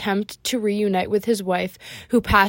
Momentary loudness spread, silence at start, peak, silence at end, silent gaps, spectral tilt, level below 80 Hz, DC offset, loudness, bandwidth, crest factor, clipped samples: 4 LU; 0 s; -2 dBFS; 0 s; none; -4.5 dB/octave; -42 dBFS; under 0.1%; -22 LUFS; 16.5 kHz; 18 dB; under 0.1%